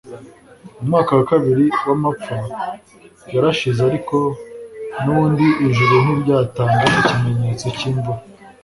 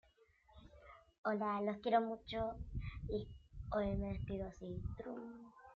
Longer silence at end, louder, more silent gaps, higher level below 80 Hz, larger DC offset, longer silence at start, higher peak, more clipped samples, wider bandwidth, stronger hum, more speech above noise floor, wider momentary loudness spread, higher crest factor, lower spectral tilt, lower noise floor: first, 0.15 s vs 0 s; first, -17 LUFS vs -42 LUFS; second, none vs 1.18-1.24 s; first, -48 dBFS vs -54 dBFS; neither; second, 0.05 s vs 0.5 s; first, -2 dBFS vs -20 dBFS; neither; first, 11.5 kHz vs 7 kHz; neither; second, 26 dB vs 30 dB; second, 14 LU vs 19 LU; second, 16 dB vs 22 dB; about the same, -7 dB/octave vs -6 dB/octave; second, -42 dBFS vs -71 dBFS